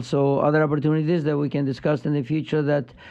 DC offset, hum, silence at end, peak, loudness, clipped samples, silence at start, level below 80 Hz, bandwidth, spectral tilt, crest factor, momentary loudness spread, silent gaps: under 0.1%; none; 0 s; -8 dBFS; -22 LUFS; under 0.1%; 0 s; -60 dBFS; 8.2 kHz; -8.5 dB/octave; 14 dB; 5 LU; none